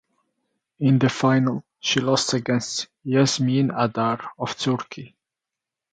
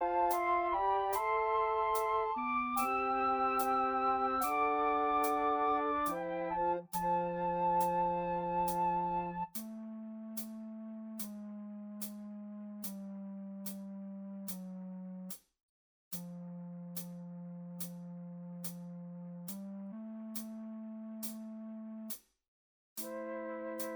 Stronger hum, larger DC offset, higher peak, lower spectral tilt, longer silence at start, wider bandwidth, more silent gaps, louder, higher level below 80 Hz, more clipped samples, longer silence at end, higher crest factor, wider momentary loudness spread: neither; neither; first, -4 dBFS vs -20 dBFS; about the same, -5 dB/octave vs -5 dB/octave; first, 0.8 s vs 0 s; second, 9.4 kHz vs over 20 kHz; second, none vs 15.63-16.11 s, 22.48-22.96 s; first, -22 LUFS vs -36 LUFS; about the same, -64 dBFS vs -66 dBFS; neither; first, 0.85 s vs 0 s; about the same, 18 dB vs 16 dB; second, 9 LU vs 15 LU